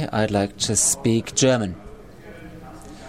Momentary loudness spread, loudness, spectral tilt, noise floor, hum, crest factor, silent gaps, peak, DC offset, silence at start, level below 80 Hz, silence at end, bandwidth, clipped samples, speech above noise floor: 23 LU; -20 LUFS; -3.5 dB/octave; -42 dBFS; none; 18 dB; none; -4 dBFS; 0.3%; 0 s; -48 dBFS; 0 s; 16 kHz; under 0.1%; 21 dB